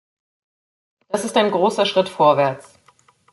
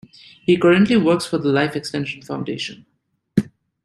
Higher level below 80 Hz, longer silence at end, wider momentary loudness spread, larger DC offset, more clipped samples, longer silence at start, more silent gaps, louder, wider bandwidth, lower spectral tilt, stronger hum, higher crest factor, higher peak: second, -68 dBFS vs -56 dBFS; first, 0.7 s vs 0.4 s; second, 10 LU vs 14 LU; neither; neither; first, 1.1 s vs 0.5 s; neither; about the same, -18 LUFS vs -19 LUFS; about the same, 12 kHz vs 12.5 kHz; second, -4.5 dB/octave vs -6 dB/octave; neither; about the same, 18 dB vs 18 dB; about the same, -2 dBFS vs -2 dBFS